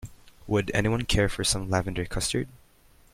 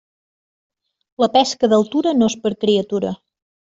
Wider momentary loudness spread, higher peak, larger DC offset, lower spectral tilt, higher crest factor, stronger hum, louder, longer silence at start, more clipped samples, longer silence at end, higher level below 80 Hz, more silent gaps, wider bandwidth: about the same, 7 LU vs 8 LU; second, -10 dBFS vs -4 dBFS; neither; about the same, -4 dB/octave vs -5 dB/octave; about the same, 18 dB vs 16 dB; neither; second, -27 LUFS vs -18 LUFS; second, 0 s vs 1.2 s; neither; first, 0.6 s vs 0.45 s; first, -40 dBFS vs -60 dBFS; neither; first, 16 kHz vs 7.8 kHz